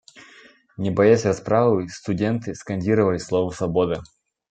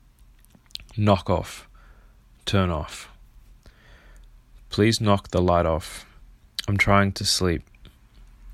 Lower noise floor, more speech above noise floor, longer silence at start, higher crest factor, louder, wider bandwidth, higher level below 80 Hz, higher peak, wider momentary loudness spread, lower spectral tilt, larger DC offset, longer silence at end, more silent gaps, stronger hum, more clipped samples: about the same, -51 dBFS vs -53 dBFS; about the same, 30 dB vs 31 dB; second, 0.15 s vs 0.8 s; about the same, 18 dB vs 22 dB; about the same, -22 LUFS vs -23 LUFS; second, 9 kHz vs 14.5 kHz; second, -54 dBFS vs -42 dBFS; about the same, -2 dBFS vs -4 dBFS; second, 11 LU vs 20 LU; first, -7 dB/octave vs -5 dB/octave; neither; first, 0.45 s vs 0 s; neither; neither; neither